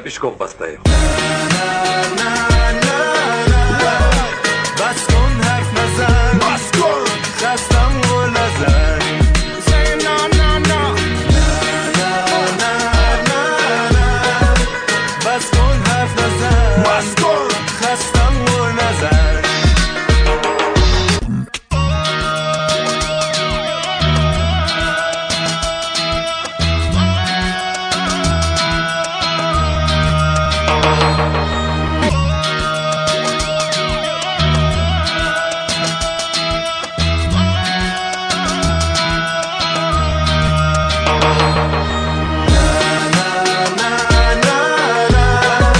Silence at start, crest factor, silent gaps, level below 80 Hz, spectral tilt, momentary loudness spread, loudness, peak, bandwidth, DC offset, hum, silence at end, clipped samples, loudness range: 0 s; 14 dB; none; -20 dBFS; -4.5 dB/octave; 4 LU; -15 LUFS; 0 dBFS; 10 kHz; under 0.1%; none; 0 s; under 0.1%; 2 LU